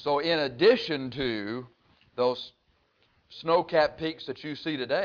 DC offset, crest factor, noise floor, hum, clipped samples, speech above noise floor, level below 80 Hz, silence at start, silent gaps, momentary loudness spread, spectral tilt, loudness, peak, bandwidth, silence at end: under 0.1%; 18 dB; -68 dBFS; none; under 0.1%; 41 dB; -62 dBFS; 0 s; none; 15 LU; -6 dB/octave; -27 LUFS; -10 dBFS; 5.4 kHz; 0 s